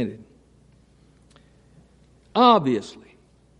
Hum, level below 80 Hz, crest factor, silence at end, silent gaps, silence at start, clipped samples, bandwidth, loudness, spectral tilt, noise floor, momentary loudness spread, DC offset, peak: none; -62 dBFS; 22 dB; 0.7 s; none; 0 s; under 0.1%; 9.4 kHz; -20 LUFS; -6 dB/octave; -56 dBFS; 16 LU; under 0.1%; -2 dBFS